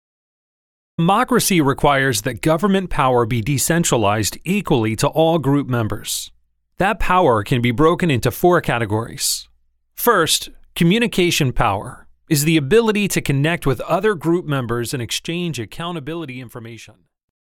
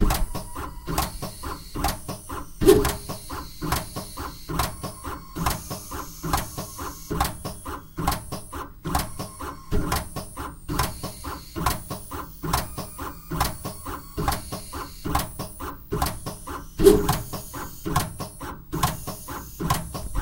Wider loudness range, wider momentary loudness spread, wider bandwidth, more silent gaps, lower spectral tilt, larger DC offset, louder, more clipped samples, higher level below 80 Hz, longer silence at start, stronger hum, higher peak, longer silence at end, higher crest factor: second, 3 LU vs 6 LU; about the same, 11 LU vs 10 LU; first, 19 kHz vs 17 kHz; neither; about the same, -4.5 dB/octave vs -4.5 dB/octave; neither; first, -18 LUFS vs -28 LUFS; neither; about the same, -38 dBFS vs -34 dBFS; first, 1 s vs 0 s; neither; about the same, -2 dBFS vs -2 dBFS; first, 0.65 s vs 0 s; second, 16 dB vs 26 dB